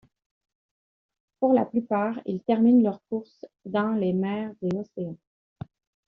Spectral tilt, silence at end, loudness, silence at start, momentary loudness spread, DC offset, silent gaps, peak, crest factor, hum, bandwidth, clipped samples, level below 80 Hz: -7.5 dB/octave; 0.95 s; -25 LUFS; 1.4 s; 24 LU; under 0.1%; none; -10 dBFS; 18 dB; none; 4.8 kHz; under 0.1%; -68 dBFS